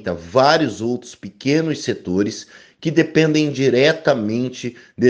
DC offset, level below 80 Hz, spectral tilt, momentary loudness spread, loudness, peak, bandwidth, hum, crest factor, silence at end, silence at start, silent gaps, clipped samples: under 0.1%; -56 dBFS; -5.5 dB/octave; 12 LU; -18 LUFS; 0 dBFS; 9.4 kHz; none; 18 dB; 0 s; 0 s; none; under 0.1%